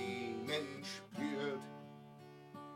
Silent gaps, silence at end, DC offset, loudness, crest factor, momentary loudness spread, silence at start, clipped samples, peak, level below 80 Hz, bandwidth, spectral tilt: none; 0 s; under 0.1%; -42 LUFS; 18 dB; 16 LU; 0 s; under 0.1%; -26 dBFS; -88 dBFS; 16.5 kHz; -4.5 dB/octave